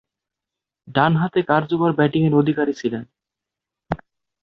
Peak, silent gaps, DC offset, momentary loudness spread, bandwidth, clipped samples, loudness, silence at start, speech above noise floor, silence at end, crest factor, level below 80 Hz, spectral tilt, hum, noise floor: -2 dBFS; none; under 0.1%; 13 LU; 6.6 kHz; under 0.1%; -19 LUFS; 0.85 s; 67 dB; 0.45 s; 20 dB; -54 dBFS; -8 dB/octave; none; -86 dBFS